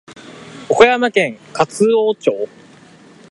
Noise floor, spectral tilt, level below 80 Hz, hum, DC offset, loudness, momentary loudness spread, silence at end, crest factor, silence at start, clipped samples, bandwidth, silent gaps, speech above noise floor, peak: -44 dBFS; -4.5 dB/octave; -56 dBFS; none; under 0.1%; -15 LUFS; 22 LU; 0.85 s; 16 dB; 0.1 s; under 0.1%; 11.5 kHz; none; 29 dB; 0 dBFS